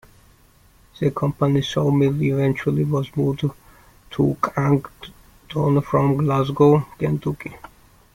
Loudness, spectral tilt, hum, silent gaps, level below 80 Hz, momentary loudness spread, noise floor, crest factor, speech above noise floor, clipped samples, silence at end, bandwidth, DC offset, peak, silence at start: -20 LUFS; -8 dB/octave; none; none; -50 dBFS; 13 LU; -53 dBFS; 18 dB; 34 dB; under 0.1%; 0.55 s; 14.5 kHz; under 0.1%; -4 dBFS; 1 s